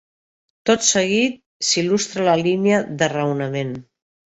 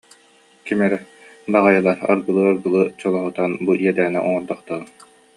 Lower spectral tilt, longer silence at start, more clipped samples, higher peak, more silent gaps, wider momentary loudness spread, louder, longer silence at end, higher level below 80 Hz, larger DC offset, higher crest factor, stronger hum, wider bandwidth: second, -3.5 dB/octave vs -7.5 dB/octave; about the same, 0.65 s vs 0.65 s; neither; about the same, -2 dBFS vs -2 dBFS; first, 1.46-1.60 s vs none; about the same, 10 LU vs 12 LU; about the same, -19 LUFS vs -19 LUFS; about the same, 0.5 s vs 0.5 s; first, -60 dBFS vs -66 dBFS; neither; about the same, 18 dB vs 18 dB; neither; second, 8.2 kHz vs 11 kHz